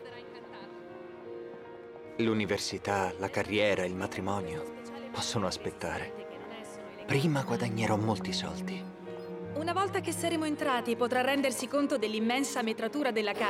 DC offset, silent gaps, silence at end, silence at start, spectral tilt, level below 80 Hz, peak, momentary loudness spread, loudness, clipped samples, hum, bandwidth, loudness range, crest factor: under 0.1%; none; 0 s; 0 s; -4.5 dB/octave; -64 dBFS; -14 dBFS; 17 LU; -32 LUFS; under 0.1%; none; 16.5 kHz; 5 LU; 20 dB